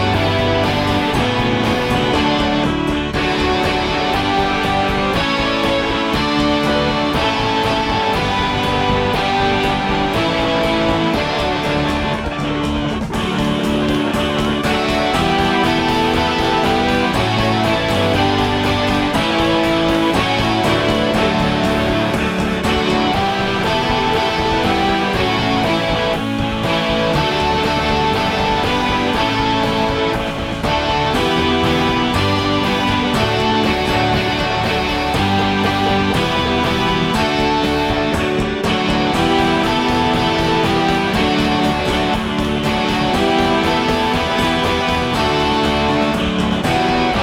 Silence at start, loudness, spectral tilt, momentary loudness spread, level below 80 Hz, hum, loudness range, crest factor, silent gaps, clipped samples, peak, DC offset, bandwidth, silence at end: 0 s; -16 LUFS; -5 dB/octave; 2 LU; -32 dBFS; none; 1 LU; 14 dB; none; under 0.1%; -2 dBFS; under 0.1%; 16.5 kHz; 0 s